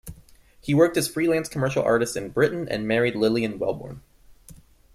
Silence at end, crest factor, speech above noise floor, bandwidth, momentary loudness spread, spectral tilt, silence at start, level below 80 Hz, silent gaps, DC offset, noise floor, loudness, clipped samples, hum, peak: 0.4 s; 18 dB; 29 dB; 15.5 kHz; 11 LU; -5.5 dB/octave; 0.05 s; -52 dBFS; none; under 0.1%; -52 dBFS; -23 LUFS; under 0.1%; none; -6 dBFS